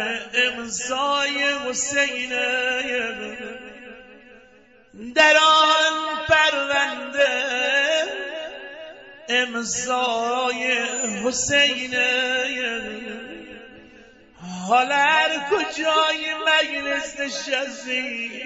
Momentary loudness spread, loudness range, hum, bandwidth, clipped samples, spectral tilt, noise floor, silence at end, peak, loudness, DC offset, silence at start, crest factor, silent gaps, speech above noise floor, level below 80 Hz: 17 LU; 6 LU; none; 8.2 kHz; under 0.1%; -1 dB/octave; -53 dBFS; 0 s; -4 dBFS; -20 LUFS; under 0.1%; 0 s; 20 dB; none; 31 dB; -58 dBFS